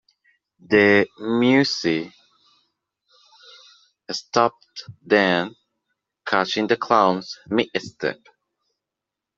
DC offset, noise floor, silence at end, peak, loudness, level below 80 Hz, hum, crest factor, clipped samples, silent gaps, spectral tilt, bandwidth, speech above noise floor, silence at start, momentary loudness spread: under 0.1%; -85 dBFS; 1.25 s; -2 dBFS; -20 LUFS; -66 dBFS; none; 20 dB; under 0.1%; none; -5 dB/octave; 7.6 kHz; 65 dB; 0.7 s; 17 LU